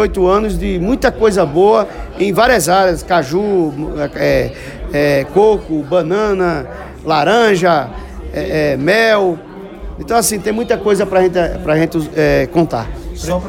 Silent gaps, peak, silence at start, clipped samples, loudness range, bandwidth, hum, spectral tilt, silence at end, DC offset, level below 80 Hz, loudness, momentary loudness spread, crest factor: none; 0 dBFS; 0 s; under 0.1%; 2 LU; 16.5 kHz; none; -5 dB/octave; 0 s; under 0.1%; -30 dBFS; -14 LUFS; 12 LU; 12 dB